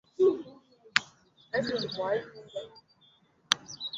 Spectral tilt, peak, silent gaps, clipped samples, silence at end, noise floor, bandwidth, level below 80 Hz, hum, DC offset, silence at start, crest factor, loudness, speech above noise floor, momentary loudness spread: -3 dB/octave; 0 dBFS; none; under 0.1%; 0 s; -65 dBFS; 12.5 kHz; -70 dBFS; none; under 0.1%; 0.2 s; 32 dB; -31 LUFS; 31 dB; 16 LU